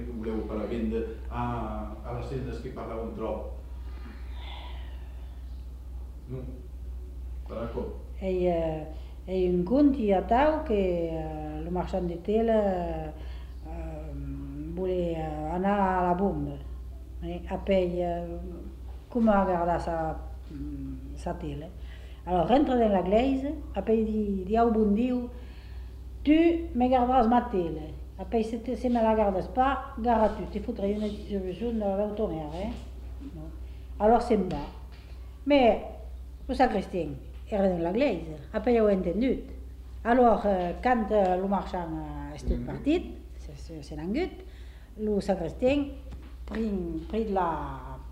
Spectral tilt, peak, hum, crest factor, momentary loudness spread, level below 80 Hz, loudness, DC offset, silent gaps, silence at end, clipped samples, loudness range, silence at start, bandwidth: -8 dB/octave; -10 dBFS; none; 18 dB; 19 LU; -40 dBFS; -28 LUFS; under 0.1%; none; 0 s; under 0.1%; 9 LU; 0 s; 13 kHz